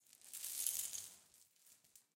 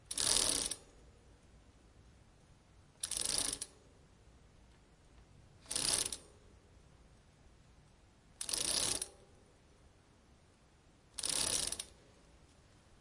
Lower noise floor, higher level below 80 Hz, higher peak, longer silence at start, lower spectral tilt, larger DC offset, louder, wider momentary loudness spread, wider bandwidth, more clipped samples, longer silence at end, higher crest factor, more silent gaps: first, -70 dBFS vs -66 dBFS; second, -88 dBFS vs -62 dBFS; second, -20 dBFS vs -10 dBFS; about the same, 0.1 s vs 0.1 s; second, 2.5 dB/octave vs 0 dB/octave; neither; second, -43 LUFS vs -35 LUFS; first, 22 LU vs 15 LU; first, 17 kHz vs 11.5 kHz; neither; second, 0.15 s vs 1.1 s; about the same, 30 dB vs 34 dB; neither